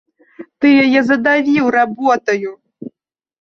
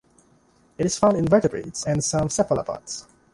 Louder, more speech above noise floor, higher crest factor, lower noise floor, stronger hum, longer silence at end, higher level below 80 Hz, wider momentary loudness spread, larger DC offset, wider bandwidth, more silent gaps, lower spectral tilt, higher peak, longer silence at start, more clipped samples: first, -13 LUFS vs -22 LUFS; first, 54 dB vs 37 dB; second, 14 dB vs 20 dB; first, -67 dBFS vs -59 dBFS; neither; first, 0.55 s vs 0.3 s; second, -60 dBFS vs -50 dBFS; first, 23 LU vs 13 LU; neither; second, 6.6 kHz vs 11.5 kHz; neither; about the same, -5.5 dB/octave vs -5 dB/octave; about the same, -2 dBFS vs -4 dBFS; second, 0.4 s vs 0.8 s; neither